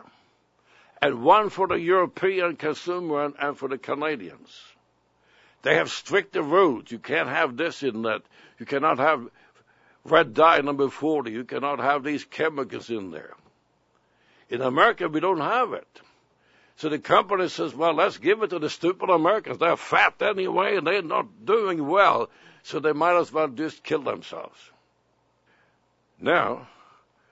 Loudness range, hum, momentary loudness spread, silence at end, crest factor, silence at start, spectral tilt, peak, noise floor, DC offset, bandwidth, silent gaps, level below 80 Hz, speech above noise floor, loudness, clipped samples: 6 LU; none; 13 LU; 0.65 s; 22 dB; 1 s; -5 dB/octave; -2 dBFS; -67 dBFS; under 0.1%; 8 kHz; none; -70 dBFS; 44 dB; -24 LUFS; under 0.1%